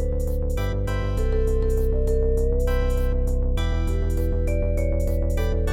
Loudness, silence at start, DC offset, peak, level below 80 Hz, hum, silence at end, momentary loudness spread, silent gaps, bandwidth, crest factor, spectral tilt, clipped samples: -25 LUFS; 0 s; under 0.1%; -10 dBFS; -22 dBFS; none; 0 s; 3 LU; none; 15.5 kHz; 10 dB; -7.5 dB/octave; under 0.1%